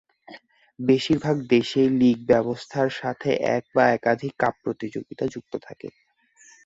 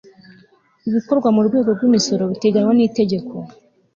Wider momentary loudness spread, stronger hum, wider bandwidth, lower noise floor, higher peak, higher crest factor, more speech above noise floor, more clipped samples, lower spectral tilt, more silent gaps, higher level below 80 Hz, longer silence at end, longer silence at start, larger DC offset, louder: about the same, 15 LU vs 15 LU; neither; about the same, 8 kHz vs 7.4 kHz; about the same, -56 dBFS vs -53 dBFS; about the same, -4 dBFS vs -4 dBFS; first, 20 dB vs 14 dB; second, 33 dB vs 37 dB; neither; about the same, -6.5 dB/octave vs -6 dB/octave; neither; about the same, -60 dBFS vs -60 dBFS; first, 0.75 s vs 0.45 s; second, 0.3 s vs 0.85 s; neither; second, -23 LUFS vs -17 LUFS